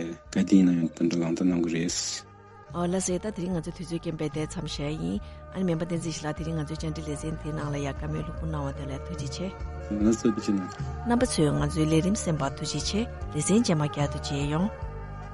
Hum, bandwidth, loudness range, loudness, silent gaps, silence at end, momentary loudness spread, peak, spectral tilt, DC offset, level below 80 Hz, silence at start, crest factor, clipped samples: none; 11.5 kHz; 6 LU; -28 LUFS; none; 0 s; 11 LU; -8 dBFS; -5.5 dB/octave; under 0.1%; -42 dBFS; 0 s; 20 dB; under 0.1%